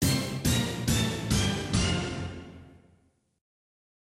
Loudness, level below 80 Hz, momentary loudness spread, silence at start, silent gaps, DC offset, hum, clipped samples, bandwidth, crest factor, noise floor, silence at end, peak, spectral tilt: -28 LUFS; -42 dBFS; 12 LU; 0 s; none; under 0.1%; none; under 0.1%; 16 kHz; 18 dB; -66 dBFS; 1.3 s; -12 dBFS; -4 dB/octave